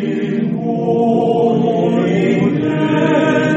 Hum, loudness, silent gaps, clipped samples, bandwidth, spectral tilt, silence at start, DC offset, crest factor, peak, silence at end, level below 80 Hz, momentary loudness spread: none; -15 LUFS; none; under 0.1%; 8 kHz; -8 dB/octave; 0 s; under 0.1%; 12 dB; -2 dBFS; 0 s; -56 dBFS; 5 LU